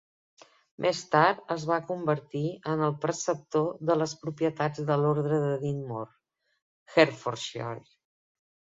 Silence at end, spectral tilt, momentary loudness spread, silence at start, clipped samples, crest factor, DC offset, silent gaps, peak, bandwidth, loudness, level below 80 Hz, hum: 0.95 s; -5.5 dB/octave; 11 LU; 0.8 s; under 0.1%; 24 dB; under 0.1%; 6.62-6.86 s; -6 dBFS; 7.8 kHz; -28 LUFS; -70 dBFS; none